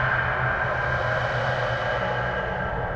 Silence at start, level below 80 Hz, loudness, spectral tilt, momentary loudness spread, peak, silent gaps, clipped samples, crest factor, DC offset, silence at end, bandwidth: 0 s; -40 dBFS; -25 LUFS; -6 dB/octave; 4 LU; -12 dBFS; none; under 0.1%; 12 dB; under 0.1%; 0 s; 8 kHz